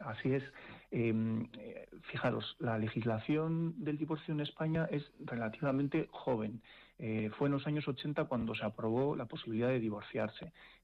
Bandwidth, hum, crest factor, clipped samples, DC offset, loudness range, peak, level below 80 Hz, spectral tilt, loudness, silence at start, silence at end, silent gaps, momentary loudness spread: 5.8 kHz; none; 12 dB; under 0.1%; under 0.1%; 1 LU; -26 dBFS; -66 dBFS; -9 dB/octave; -37 LUFS; 0 s; 0.1 s; none; 10 LU